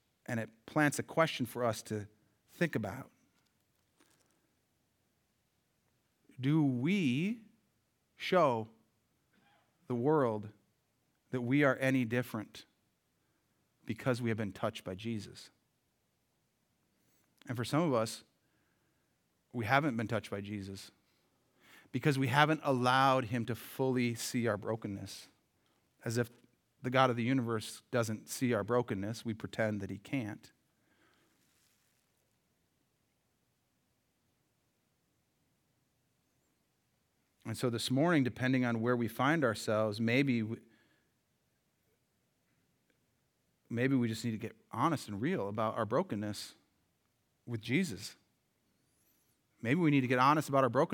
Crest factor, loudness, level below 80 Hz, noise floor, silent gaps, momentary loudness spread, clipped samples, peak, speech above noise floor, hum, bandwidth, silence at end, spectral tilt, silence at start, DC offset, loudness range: 26 dB; -34 LUFS; -82 dBFS; -79 dBFS; none; 15 LU; under 0.1%; -10 dBFS; 46 dB; none; 19 kHz; 0 s; -6 dB/octave; 0.3 s; under 0.1%; 10 LU